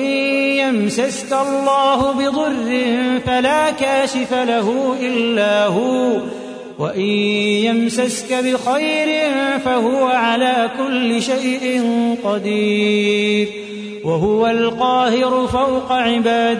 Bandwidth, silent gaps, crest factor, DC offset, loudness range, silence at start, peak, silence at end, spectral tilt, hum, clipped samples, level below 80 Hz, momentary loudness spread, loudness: 11 kHz; none; 12 dB; under 0.1%; 1 LU; 0 s; -4 dBFS; 0 s; -4.5 dB/octave; none; under 0.1%; -50 dBFS; 4 LU; -17 LUFS